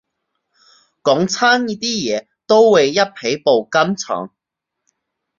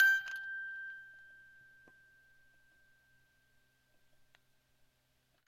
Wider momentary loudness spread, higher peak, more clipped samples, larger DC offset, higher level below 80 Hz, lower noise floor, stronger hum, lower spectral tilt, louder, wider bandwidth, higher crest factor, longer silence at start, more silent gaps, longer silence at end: second, 12 LU vs 27 LU; first, -2 dBFS vs -14 dBFS; neither; neither; first, -62 dBFS vs -82 dBFS; first, -81 dBFS vs -76 dBFS; neither; first, -3.5 dB/octave vs 1.5 dB/octave; first, -16 LUFS vs -36 LUFS; second, 7.4 kHz vs 15.5 kHz; second, 16 dB vs 28 dB; first, 1.05 s vs 0 s; neither; second, 1.1 s vs 4.15 s